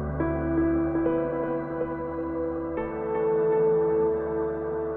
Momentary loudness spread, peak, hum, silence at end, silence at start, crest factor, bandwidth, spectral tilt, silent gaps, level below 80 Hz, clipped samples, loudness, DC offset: 8 LU; -12 dBFS; none; 0 s; 0 s; 14 dB; 3.6 kHz; -11.5 dB/octave; none; -44 dBFS; under 0.1%; -27 LUFS; under 0.1%